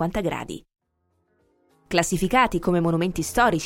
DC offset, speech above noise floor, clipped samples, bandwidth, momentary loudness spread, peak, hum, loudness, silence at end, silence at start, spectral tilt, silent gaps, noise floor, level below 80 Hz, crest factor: under 0.1%; 49 dB; under 0.1%; 17 kHz; 12 LU; -6 dBFS; none; -23 LUFS; 0 s; 0 s; -5 dB/octave; none; -71 dBFS; -42 dBFS; 18 dB